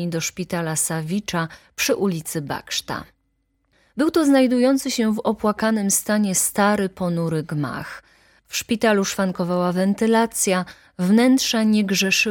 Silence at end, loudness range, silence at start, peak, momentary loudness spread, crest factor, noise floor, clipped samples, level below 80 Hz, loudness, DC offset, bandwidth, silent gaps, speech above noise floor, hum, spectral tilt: 0 s; 5 LU; 0 s; -4 dBFS; 11 LU; 16 dB; -69 dBFS; under 0.1%; -56 dBFS; -20 LUFS; under 0.1%; 17.5 kHz; none; 48 dB; none; -4 dB/octave